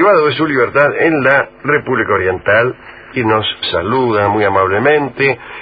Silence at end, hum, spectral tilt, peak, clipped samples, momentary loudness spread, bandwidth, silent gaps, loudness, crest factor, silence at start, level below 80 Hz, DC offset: 0 s; none; -8.5 dB/octave; 0 dBFS; under 0.1%; 5 LU; 5 kHz; none; -13 LUFS; 14 dB; 0 s; -42 dBFS; under 0.1%